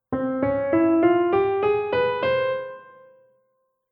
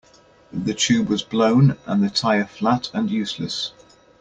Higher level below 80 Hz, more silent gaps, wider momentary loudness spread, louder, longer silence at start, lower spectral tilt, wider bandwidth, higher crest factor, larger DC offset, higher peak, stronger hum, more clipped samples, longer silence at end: about the same, -56 dBFS vs -54 dBFS; neither; about the same, 8 LU vs 10 LU; about the same, -22 LUFS vs -21 LUFS; second, 0.1 s vs 0.55 s; first, -9.5 dB/octave vs -5 dB/octave; second, 5.2 kHz vs 9.2 kHz; about the same, 14 dB vs 16 dB; neither; second, -8 dBFS vs -4 dBFS; neither; neither; first, 1.1 s vs 0.5 s